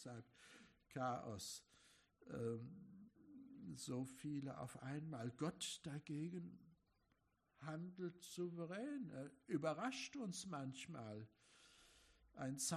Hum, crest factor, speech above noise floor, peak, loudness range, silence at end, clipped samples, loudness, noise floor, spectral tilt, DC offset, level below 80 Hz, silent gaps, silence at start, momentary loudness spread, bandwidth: none; 20 dB; 34 dB; -30 dBFS; 4 LU; 0 s; under 0.1%; -50 LUFS; -83 dBFS; -4.5 dB/octave; under 0.1%; -82 dBFS; none; 0 s; 19 LU; 13.5 kHz